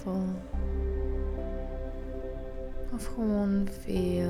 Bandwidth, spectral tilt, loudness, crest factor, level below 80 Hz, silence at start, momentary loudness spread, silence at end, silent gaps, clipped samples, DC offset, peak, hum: 14.5 kHz; -8 dB/octave; -34 LUFS; 12 dB; -36 dBFS; 0 s; 11 LU; 0 s; none; under 0.1%; under 0.1%; -18 dBFS; none